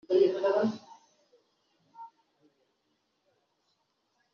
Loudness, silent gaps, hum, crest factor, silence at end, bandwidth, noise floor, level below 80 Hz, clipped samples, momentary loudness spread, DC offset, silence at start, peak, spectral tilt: -28 LUFS; none; none; 20 dB; 2.3 s; 6.8 kHz; -77 dBFS; -82 dBFS; under 0.1%; 25 LU; under 0.1%; 0.1 s; -14 dBFS; -5 dB/octave